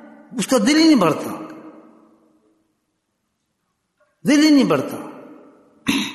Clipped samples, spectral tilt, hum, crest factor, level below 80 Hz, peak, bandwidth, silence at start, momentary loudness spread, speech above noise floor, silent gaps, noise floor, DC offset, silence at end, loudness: under 0.1%; -4.5 dB/octave; none; 16 dB; -60 dBFS; -4 dBFS; 12.5 kHz; 0.3 s; 20 LU; 57 dB; none; -73 dBFS; under 0.1%; 0 s; -17 LUFS